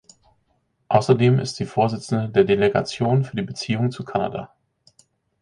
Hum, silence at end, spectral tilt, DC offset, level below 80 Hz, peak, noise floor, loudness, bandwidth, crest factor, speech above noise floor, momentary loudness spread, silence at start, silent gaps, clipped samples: none; 0.95 s; -6.5 dB/octave; under 0.1%; -54 dBFS; -2 dBFS; -68 dBFS; -21 LUFS; 10.5 kHz; 20 dB; 48 dB; 9 LU; 0.9 s; none; under 0.1%